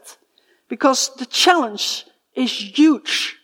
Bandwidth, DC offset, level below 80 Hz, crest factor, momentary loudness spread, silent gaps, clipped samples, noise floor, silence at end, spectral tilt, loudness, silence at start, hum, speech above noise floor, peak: 16.5 kHz; under 0.1%; -76 dBFS; 18 dB; 11 LU; none; under 0.1%; -60 dBFS; 0.1 s; -1 dB/octave; -18 LUFS; 0.05 s; none; 42 dB; -2 dBFS